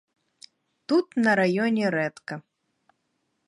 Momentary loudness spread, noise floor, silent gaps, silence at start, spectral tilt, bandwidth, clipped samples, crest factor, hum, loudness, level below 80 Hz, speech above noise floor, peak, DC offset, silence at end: 17 LU; -75 dBFS; none; 0.9 s; -6.5 dB/octave; 11.5 kHz; under 0.1%; 18 dB; none; -24 LUFS; -76 dBFS; 52 dB; -8 dBFS; under 0.1%; 1.1 s